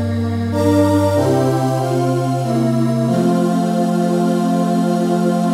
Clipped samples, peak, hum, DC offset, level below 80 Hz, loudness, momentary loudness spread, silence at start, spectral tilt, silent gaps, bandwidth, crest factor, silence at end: under 0.1%; -2 dBFS; none; under 0.1%; -58 dBFS; -16 LUFS; 3 LU; 0 s; -7.5 dB/octave; none; 16 kHz; 14 dB; 0 s